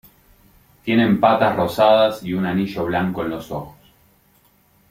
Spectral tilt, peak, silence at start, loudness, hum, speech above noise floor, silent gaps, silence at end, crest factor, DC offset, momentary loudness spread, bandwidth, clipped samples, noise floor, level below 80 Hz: -7 dB/octave; -2 dBFS; 0.85 s; -18 LUFS; none; 39 dB; none; 1.2 s; 18 dB; under 0.1%; 16 LU; 16 kHz; under 0.1%; -57 dBFS; -52 dBFS